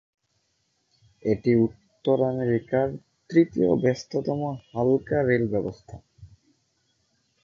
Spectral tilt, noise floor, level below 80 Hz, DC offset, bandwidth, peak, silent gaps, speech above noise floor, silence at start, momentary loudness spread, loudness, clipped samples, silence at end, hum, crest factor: -8 dB/octave; -72 dBFS; -56 dBFS; under 0.1%; 7.2 kHz; -6 dBFS; none; 49 dB; 1.25 s; 10 LU; -25 LUFS; under 0.1%; 1.15 s; none; 20 dB